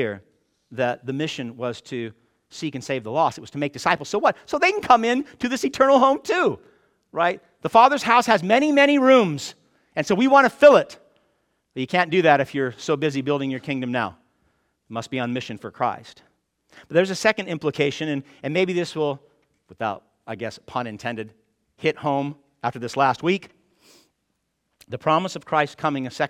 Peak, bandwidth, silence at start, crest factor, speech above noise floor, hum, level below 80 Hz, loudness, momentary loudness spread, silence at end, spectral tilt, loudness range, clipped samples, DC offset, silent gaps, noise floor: -2 dBFS; 15 kHz; 0 s; 20 dB; 53 dB; none; -64 dBFS; -21 LUFS; 17 LU; 0 s; -5 dB/octave; 11 LU; under 0.1%; under 0.1%; none; -74 dBFS